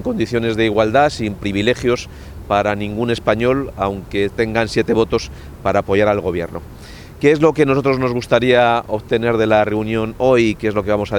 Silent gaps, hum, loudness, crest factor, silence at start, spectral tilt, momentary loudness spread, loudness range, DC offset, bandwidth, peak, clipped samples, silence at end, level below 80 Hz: none; none; -17 LUFS; 16 dB; 0 s; -6 dB/octave; 9 LU; 3 LU; under 0.1%; 18.5 kHz; 0 dBFS; under 0.1%; 0 s; -38 dBFS